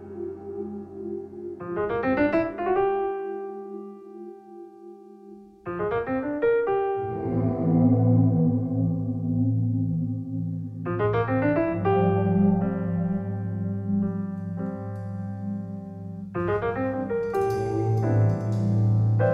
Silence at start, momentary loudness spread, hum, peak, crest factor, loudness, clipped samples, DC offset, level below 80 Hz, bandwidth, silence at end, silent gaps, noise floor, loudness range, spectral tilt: 0 s; 15 LU; none; -10 dBFS; 16 dB; -26 LUFS; under 0.1%; under 0.1%; -52 dBFS; 6.2 kHz; 0 s; none; -47 dBFS; 7 LU; -10 dB/octave